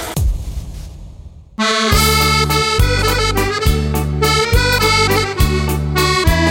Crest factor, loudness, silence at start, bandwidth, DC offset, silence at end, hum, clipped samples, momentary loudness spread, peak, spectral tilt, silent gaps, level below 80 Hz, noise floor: 14 dB; -14 LUFS; 0 s; 17 kHz; under 0.1%; 0 s; none; under 0.1%; 14 LU; 0 dBFS; -4 dB/octave; none; -20 dBFS; -36 dBFS